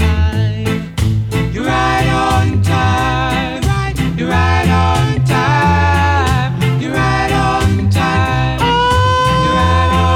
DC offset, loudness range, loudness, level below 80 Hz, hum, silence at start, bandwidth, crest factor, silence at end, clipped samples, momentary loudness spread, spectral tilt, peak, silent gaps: under 0.1%; 2 LU; -14 LUFS; -24 dBFS; none; 0 s; 15.5 kHz; 10 dB; 0 s; under 0.1%; 5 LU; -6 dB/octave; -2 dBFS; none